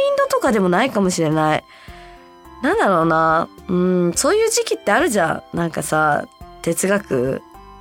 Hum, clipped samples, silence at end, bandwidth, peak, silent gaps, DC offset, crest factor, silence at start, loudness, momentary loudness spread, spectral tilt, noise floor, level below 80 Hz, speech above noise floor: none; under 0.1%; 0 s; 17 kHz; -2 dBFS; none; under 0.1%; 18 dB; 0 s; -18 LUFS; 8 LU; -4.5 dB/octave; -42 dBFS; -48 dBFS; 24 dB